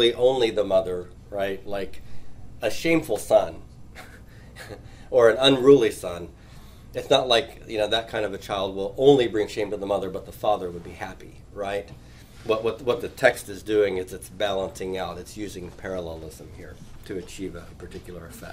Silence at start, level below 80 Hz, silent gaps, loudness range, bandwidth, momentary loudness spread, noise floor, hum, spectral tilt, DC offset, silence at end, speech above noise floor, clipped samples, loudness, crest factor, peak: 0 s; -48 dBFS; none; 11 LU; 16 kHz; 23 LU; -45 dBFS; none; -4.5 dB/octave; under 0.1%; 0 s; 21 dB; under 0.1%; -24 LUFS; 22 dB; -4 dBFS